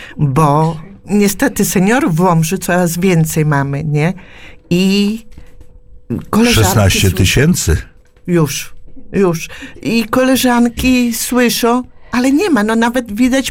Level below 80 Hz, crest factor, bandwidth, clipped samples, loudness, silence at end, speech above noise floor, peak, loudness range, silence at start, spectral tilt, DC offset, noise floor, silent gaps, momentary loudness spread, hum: -32 dBFS; 12 dB; 17.5 kHz; under 0.1%; -13 LUFS; 0 s; 23 dB; 0 dBFS; 3 LU; 0 s; -5 dB/octave; under 0.1%; -36 dBFS; none; 9 LU; none